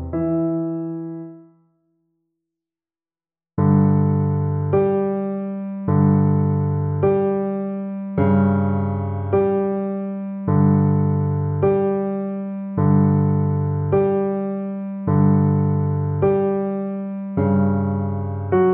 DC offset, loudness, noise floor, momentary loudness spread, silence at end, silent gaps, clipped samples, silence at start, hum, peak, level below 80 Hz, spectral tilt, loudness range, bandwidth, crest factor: under 0.1%; -20 LUFS; under -90 dBFS; 10 LU; 0 s; none; under 0.1%; 0 s; none; -4 dBFS; -52 dBFS; -14.5 dB/octave; 3 LU; 3.2 kHz; 16 dB